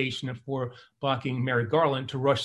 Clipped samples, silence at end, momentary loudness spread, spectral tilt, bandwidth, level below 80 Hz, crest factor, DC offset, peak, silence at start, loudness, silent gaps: under 0.1%; 0 s; 9 LU; -6 dB/octave; 11.5 kHz; -60 dBFS; 18 dB; under 0.1%; -10 dBFS; 0 s; -28 LUFS; none